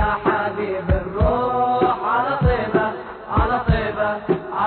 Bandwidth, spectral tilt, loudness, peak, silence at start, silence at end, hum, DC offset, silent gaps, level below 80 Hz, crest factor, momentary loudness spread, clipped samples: 4.5 kHz; -11 dB/octave; -20 LUFS; -4 dBFS; 0 s; 0 s; none; under 0.1%; none; -28 dBFS; 16 dB; 5 LU; under 0.1%